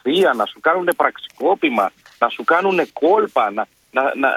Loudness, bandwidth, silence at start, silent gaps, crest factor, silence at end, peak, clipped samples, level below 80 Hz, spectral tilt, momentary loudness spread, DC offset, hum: -18 LUFS; 15.5 kHz; 0.05 s; none; 18 dB; 0 s; 0 dBFS; under 0.1%; -68 dBFS; -4.5 dB/octave; 6 LU; under 0.1%; none